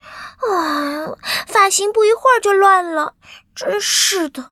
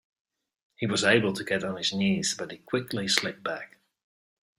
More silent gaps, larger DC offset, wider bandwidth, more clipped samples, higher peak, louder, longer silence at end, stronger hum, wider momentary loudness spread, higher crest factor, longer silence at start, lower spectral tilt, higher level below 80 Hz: neither; neither; about the same, 15 kHz vs 16 kHz; neither; first, 0 dBFS vs -4 dBFS; first, -15 LUFS vs -27 LUFS; second, 0.05 s vs 0.9 s; neither; about the same, 13 LU vs 12 LU; second, 16 dB vs 24 dB; second, 0.05 s vs 0.8 s; second, -0.5 dB/octave vs -3.5 dB/octave; first, -60 dBFS vs -66 dBFS